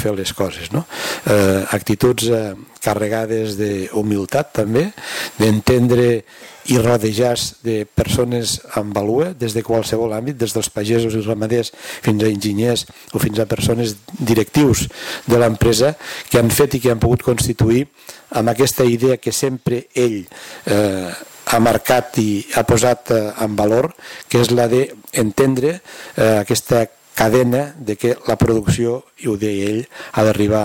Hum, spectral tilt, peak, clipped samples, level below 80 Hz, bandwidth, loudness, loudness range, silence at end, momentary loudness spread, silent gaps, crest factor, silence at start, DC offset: none; -5 dB/octave; -4 dBFS; under 0.1%; -40 dBFS; 17 kHz; -17 LUFS; 3 LU; 0 s; 9 LU; none; 12 dB; 0 s; under 0.1%